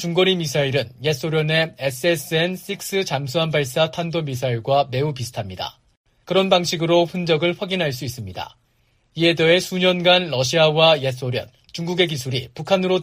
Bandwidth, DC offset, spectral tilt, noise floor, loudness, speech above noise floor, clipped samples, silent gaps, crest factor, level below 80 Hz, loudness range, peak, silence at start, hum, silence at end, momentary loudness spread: 15.5 kHz; under 0.1%; -4.5 dB/octave; -62 dBFS; -20 LUFS; 43 dB; under 0.1%; 5.97-6.04 s; 18 dB; -56 dBFS; 4 LU; -2 dBFS; 0 s; none; 0 s; 13 LU